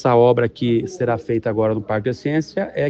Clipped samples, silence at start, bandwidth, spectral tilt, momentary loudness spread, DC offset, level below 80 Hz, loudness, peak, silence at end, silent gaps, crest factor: under 0.1%; 0 s; 7.8 kHz; -7.5 dB/octave; 8 LU; under 0.1%; -52 dBFS; -20 LUFS; -2 dBFS; 0 s; none; 16 dB